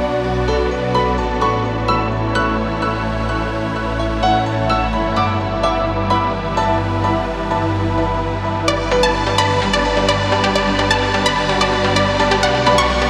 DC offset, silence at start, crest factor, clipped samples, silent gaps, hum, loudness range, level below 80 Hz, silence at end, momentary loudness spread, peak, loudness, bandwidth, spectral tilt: under 0.1%; 0 s; 16 dB; under 0.1%; none; none; 3 LU; -28 dBFS; 0 s; 5 LU; 0 dBFS; -17 LUFS; 12.5 kHz; -5 dB/octave